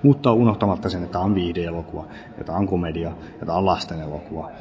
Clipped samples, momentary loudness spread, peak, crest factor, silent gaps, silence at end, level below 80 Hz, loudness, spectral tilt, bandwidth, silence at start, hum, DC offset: under 0.1%; 16 LU; -2 dBFS; 20 dB; none; 0 s; -40 dBFS; -23 LUFS; -8.5 dB/octave; 8 kHz; 0 s; none; under 0.1%